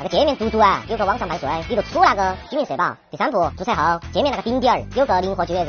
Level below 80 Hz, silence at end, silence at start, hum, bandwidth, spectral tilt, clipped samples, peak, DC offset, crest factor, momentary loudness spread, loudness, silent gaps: -40 dBFS; 0 s; 0 s; none; 6.8 kHz; -3 dB/octave; under 0.1%; -2 dBFS; under 0.1%; 18 dB; 7 LU; -20 LUFS; none